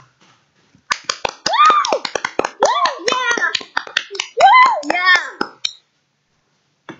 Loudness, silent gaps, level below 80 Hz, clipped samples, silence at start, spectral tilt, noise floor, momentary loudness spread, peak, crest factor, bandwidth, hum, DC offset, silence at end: -15 LUFS; none; -60 dBFS; under 0.1%; 0.9 s; -0.5 dB/octave; -65 dBFS; 13 LU; 0 dBFS; 18 dB; 9 kHz; none; under 0.1%; 0.05 s